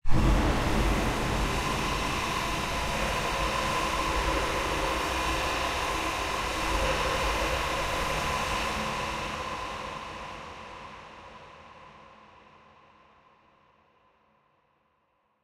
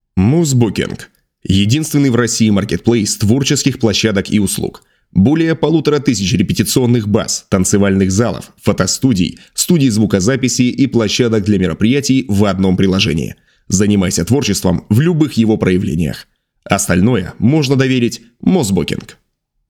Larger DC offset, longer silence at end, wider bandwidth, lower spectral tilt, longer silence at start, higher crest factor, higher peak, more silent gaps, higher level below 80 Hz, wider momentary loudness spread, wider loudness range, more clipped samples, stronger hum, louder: neither; first, 3.3 s vs 0.6 s; about the same, 16 kHz vs 17.5 kHz; about the same, -4 dB/octave vs -5 dB/octave; about the same, 0.05 s vs 0.15 s; first, 20 dB vs 14 dB; second, -10 dBFS vs 0 dBFS; neither; first, -36 dBFS vs -42 dBFS; first, 16 LU vs 6 LU; first, 14 LU vs 1 LU; neither; neither; second, -29 LUFS vs -14 LUFS